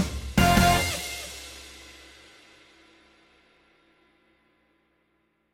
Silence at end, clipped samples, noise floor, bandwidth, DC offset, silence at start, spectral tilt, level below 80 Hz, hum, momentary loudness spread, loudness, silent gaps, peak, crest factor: 3.6 s; under 0.1%; -71 dBFS; 17 kHz; under 0.1%; 0 s; -4 dB/octave; -40 dBFS; none; 27 LU; -23 LUFS; none; -6 dBFS; 24 dB